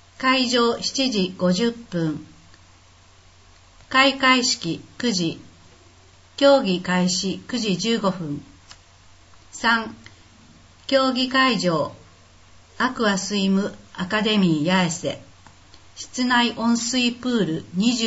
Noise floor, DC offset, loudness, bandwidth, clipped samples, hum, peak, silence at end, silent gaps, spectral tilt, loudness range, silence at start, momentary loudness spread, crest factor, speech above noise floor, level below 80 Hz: -51 dBFS; under 0.1%; -21 LUFS; 8 kHz; under 0.1%; none; -2 dBFS; 0 s; none; -4 dB/octave; 4 LU; 0.2 s; 13 LU; 20 dB; 30 dB; -58 dBFS